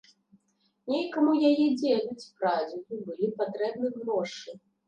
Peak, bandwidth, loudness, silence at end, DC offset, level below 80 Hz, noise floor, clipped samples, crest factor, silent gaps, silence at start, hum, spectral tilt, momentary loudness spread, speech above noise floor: -12 dBFS; 8.6 kHz; -28 LUFS; 0.3 s; under 0.1%; -80 dBFS; -72 dBFS; under 0.1%; 16 dB; none; 0.85 s; none; -5.5 dB/octave; 15 LU; 44 dB